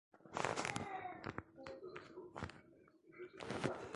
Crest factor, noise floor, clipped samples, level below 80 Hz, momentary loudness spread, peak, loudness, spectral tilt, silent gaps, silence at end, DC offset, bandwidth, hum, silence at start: 28 dB; -67 dBFS; under 0.1%; -70 dBFS; 14 LU; -18 dBFS; -46 LUFS; -4.5 dB/octave; none; 0 s; under 0.1%; 11.5 kHz; none; 0.15 s